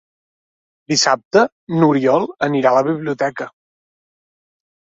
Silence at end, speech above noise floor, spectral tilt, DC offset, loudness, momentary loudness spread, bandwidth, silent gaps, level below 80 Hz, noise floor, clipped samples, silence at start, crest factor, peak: 1.4 s; over 74 dB; -4.5 dB/octave; under 0.1%; -16 LUFS; 7 LU; 8 kHz; 1.25-1.31 s, 1.52-1.67 s; -62 dBFS; under -90 dBFS; under 0.1%; 0.9 s; 16 dB; -2 dBFS